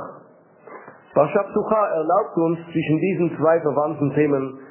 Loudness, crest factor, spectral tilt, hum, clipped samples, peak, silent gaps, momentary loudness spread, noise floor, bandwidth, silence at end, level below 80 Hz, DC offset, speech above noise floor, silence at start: -21 LUFS; 18 dB; -12 dB/octave; none; under 0.1%; -4 dBFS; none; 5 LU; -49 dBFS; 3.2 kHz; 0 s; -62 dBFS; under 0.1%; 29 dB; 0 s